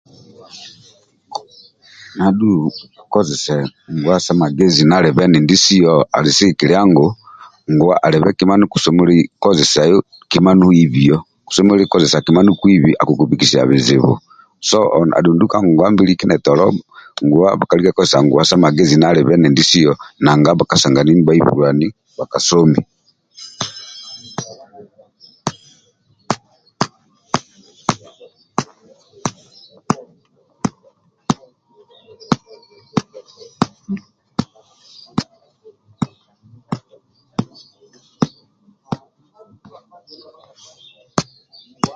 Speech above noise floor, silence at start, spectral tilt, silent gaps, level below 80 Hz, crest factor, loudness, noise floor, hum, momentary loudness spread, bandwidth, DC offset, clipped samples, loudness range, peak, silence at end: 45 dB; 0.55 s; -5.5 dB/octave; none; -48 dBFS; 14 dB; -13 LUFS; -57 dBFS; none; 19 LU; 9.4 kHz; under 0.1%; under 0.1%; 18 LU; 0 dBFS; 0.05 s